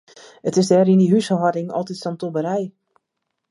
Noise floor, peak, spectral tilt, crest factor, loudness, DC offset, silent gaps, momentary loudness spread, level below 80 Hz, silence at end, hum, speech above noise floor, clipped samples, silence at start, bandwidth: -78 dBFS; -4 dBFS; -7 dB/octave; 16 dB; -19 LUFS; under 0.1%; none; 13 LU; -68 dBFS; 0.8 s; none; 59 dB; under 0.1%; 0.45 s; 11.5 kHz